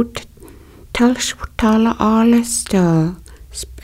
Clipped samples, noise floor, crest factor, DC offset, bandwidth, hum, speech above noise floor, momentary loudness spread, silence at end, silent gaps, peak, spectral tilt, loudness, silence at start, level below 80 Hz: under 0.1%; -40 dBFS; 16 dB; under 0.1%; 15.5 kHz; none; 25 dB; 16 LU; 0.05 s; none; 0 dBFS; -5 dB/octave; -16 LUFS; 0 s; -38 dBFS